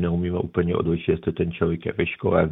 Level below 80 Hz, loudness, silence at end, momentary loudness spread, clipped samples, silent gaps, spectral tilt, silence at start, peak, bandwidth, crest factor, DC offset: -42 dBFS; -24 LUFS; 0 s; 3 LU; under 0.1%; none; -11 dB/octave; 0 s; -4 dBFS; 3.9 kHz; 18 dB; under 0.1%